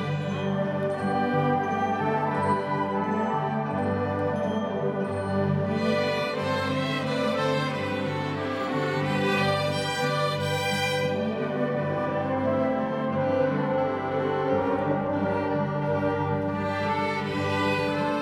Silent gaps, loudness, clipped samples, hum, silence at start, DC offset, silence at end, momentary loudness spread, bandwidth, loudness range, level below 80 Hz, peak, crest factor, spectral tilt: none; -26 LUFS; under 0.1%; none; 0 s; under 0.1%; 0 s; 3 LU; 16 kHz; 1 LU; -60 dBFS; -10 dBFS; 16 dB; -6.5 dB/octave